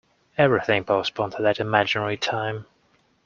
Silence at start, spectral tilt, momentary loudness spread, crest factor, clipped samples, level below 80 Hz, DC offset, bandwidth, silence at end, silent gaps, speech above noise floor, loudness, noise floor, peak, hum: 0.4 s; -5.5 dB/octave; 9 LU; 22 dB; under 0.1%; -62 dBFS; under 0.1%; 7.2 kHz; 0.6 s; none; 41 dB; -23 LUFS; -64 dBFS; -2 dBFS; none